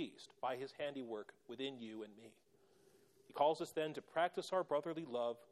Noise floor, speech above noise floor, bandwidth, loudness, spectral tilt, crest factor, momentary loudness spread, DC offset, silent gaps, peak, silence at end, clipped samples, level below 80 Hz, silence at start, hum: -71 dBFS; 28 dB; 14 kHz; -42 LUFS; -4.5 dB/octave; 20 dB; 15 LU; under 0.1%; none; -22 dBFS; 0.1 s; under 0.1%; -90 dBFS; 0 s; none